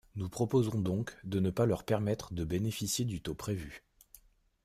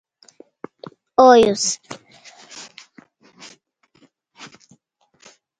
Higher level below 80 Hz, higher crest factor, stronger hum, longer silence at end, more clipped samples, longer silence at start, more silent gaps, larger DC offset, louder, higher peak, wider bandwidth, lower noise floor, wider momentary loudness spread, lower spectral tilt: first, -56 dBFS vs -62 dBFS; about the same, 18 dB vs 22 dB; neither; second, 0.85 s vs 3 s; neither; second, 0.15 s vs 1.2 s; neither; neither; second, -34 LUFS vs -15 LUFS; second, -16 dBFS vs 0 dBFS; first, 15.5 kHz vs 10.5 kHz; about the same, -62 dBFS vs -60 dBFS; second, 9 LU vs 29 LU; first, -6 dB/octave vs -3 dB/octave